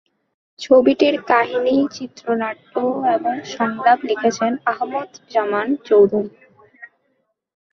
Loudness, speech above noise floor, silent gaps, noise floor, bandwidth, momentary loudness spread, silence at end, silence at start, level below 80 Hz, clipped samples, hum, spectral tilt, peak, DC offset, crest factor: -18 LUFS; 51 dB; none; -69 dBFS; 7.2 kHz; 10 LU; 0.85 s; 0.6 s; -64 dBFS; under 0.1%; none; -5 dB/octave; -2 dBFS; under 0.1%; 18 dB